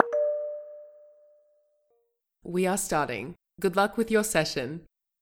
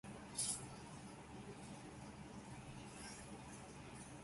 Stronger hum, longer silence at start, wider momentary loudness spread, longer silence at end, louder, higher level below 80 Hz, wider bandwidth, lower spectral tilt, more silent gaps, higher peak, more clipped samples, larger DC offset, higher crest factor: neither; about the same, 0 s vs 0.05 s; first, 18 LU vs 12 LU; first, 0.4 s vs 0 s; first, -28 LUFS vs -50 LUFS; first, -58 dBFS vs -68 dBFS; first, 17.5 kHz vs 11.5 kHz; about the same, -4 dB/octave vs -3 dB/octave; neither; first, -2 dBFS vs -28 dBFS; neither; neither; about the same, 26 dB vs 24 dB